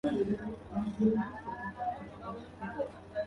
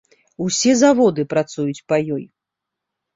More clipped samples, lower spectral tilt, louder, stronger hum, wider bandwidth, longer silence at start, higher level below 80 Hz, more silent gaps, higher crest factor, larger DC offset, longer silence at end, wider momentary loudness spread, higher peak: neither; first, -8.5 dB/octave vs -4.5 dB/octave; second, -36 LUFS vs -18 LUFS; neither; second, 6.4 kHz vs 7.8 kHz; second, 0.05 s vs 0.4 s; about the same, -58 dBFS vs -60 dBFS; neither; about the same, 18 dB vs 18 dB; neither; second, 0 s vs 0.9 s; about the same, 13 LU vs 13 LU; second, -16 dBFS vs -2 dBFS